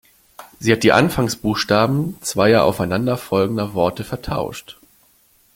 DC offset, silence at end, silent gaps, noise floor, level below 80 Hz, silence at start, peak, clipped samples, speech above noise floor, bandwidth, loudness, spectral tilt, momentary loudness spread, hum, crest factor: under 0.1%; 0.85 s; none; -56 dBFS; -46 dBFS; 0.4 s; 0 dBFS; under 0.1%; 38 dB; 17 kHz; -18 LUFS; -5.5 dB/octave; 11 LU; none; 18 dB